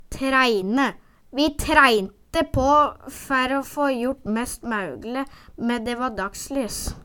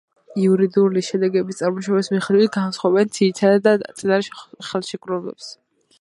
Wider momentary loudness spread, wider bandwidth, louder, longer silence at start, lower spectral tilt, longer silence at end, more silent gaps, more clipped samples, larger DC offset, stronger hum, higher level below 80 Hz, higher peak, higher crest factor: about the same, 12 LU vs 13 LU; first, 19 kHz vs 11.5 kHz; second, -22 LUFS vs -19 LUFS; second, 0.1 s vs 0.3 s; second, -4 dB/octave vs -6 dB/octave; second, 0 s vs 0.45 s; neither; neither; neither; neither; first, -40 dBFS vs -68 dBFS; about the same, -2 dBFS vs -2 dBFS; about the same, 22 dB vs 18 dB